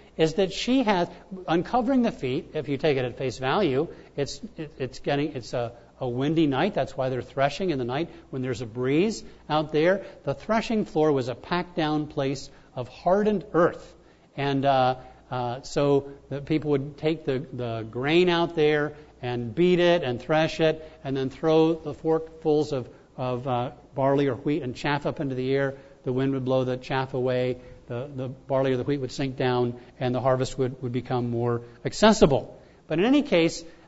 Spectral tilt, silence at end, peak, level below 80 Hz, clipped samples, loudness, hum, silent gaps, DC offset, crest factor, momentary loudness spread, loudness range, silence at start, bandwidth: -6 dB/octave; 0.1 s; -4 dBFS; -50 dBFS; under 0.1%; -26 LUFS; none; none; under 0.1%; 20 dB; 11 LU; 4 LU; 0.2 s; 8 kHz